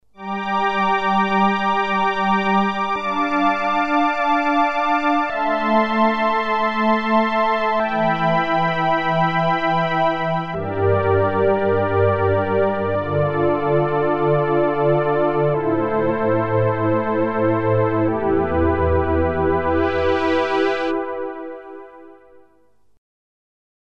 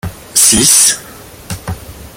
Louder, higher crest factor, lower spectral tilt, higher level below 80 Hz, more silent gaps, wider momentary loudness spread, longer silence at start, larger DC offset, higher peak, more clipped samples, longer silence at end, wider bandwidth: second, -19 LUFS vs -7 LUFS; about the same, 14 dB vs 14 dB; first, -7.5 dB/octave vs -1 dB/octave; second, -42 dBFS vs -36 dBFS; neither; second, 4 LU vs 21 LU; first, 0.2 s vs 0.05 s; neither; second, -4 dBFS vs 0 dBFS; second, under 0.1% vs 0.3%; first, 1.8 s vs 0.1 s; second, 7.6 kHz vs over 20 kHz